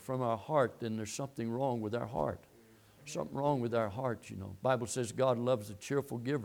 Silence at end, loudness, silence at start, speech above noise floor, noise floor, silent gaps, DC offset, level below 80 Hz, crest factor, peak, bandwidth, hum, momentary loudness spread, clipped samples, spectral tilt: 0 s; -35 LUFS; 0 s; 27 dB; -61 dBFS; none; under 0.1%; -66 dBFS; 20 dB; -16 dBFS; 20 kHz; none; 8 LU; under 0.1%; -6 dB/octave